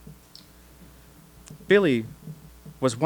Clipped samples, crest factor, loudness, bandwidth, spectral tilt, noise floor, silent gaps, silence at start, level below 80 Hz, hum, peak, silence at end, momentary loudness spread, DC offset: under 0.1%; 22 dB; -23 LUFS; over 20 kHz; -5.5 dB/octave; -51 dBFS; none; 0.05 s; -54 dBFS; none; -6 dBFS; 0 s; 27 LU; under 0.1%